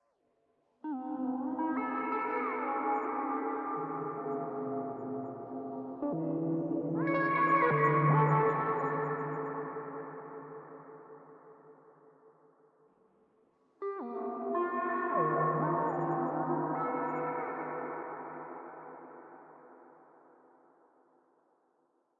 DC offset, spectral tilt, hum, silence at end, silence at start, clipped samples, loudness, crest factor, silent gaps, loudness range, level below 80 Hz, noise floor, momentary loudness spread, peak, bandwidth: under 0.1%; -8 dB/octave; none; 2.3 s; 0.85 s; under 0.1%; -33 LUFS; 20 dB; none; 18 LU; -78 dBFS; -75 dBFS; 20 LU; -16 dBFS; 4.7 kHz